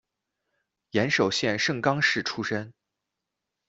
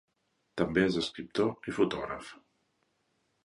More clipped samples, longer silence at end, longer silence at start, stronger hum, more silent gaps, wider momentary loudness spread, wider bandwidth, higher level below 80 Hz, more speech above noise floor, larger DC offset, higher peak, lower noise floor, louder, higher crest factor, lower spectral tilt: neither; second, 0.95 s vs 1.1 s; first, 0.95 s vs 0.55 s; neither; neither; second, 8 LU vs 14 LU; second, 8 kHz vs 11.5 kHz; second, -66 dBFS vs -60 dBFS; first, 59 dB vs 46 dB; neither; first, -6 dBFS vs -12 dBFS; first, -85 dBFS vs -77 dBFS; first, -25 LUFS vs -31 LUFS; about the same, 22 dB vs 22 dB; second, -4 dB/octave vs -5.5 dB/octave